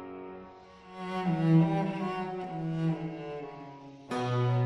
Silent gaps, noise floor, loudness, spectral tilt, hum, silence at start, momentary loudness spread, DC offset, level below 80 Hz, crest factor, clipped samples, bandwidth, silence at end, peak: none; -51 dBFS; -31 LUFS; -8.5 dB/octave; none; 0 s; 23 LU; under 0.1%; -64 dBFS; 18 dB; under 0.1%; 7.4 kHz; 0 s; -12 dBFS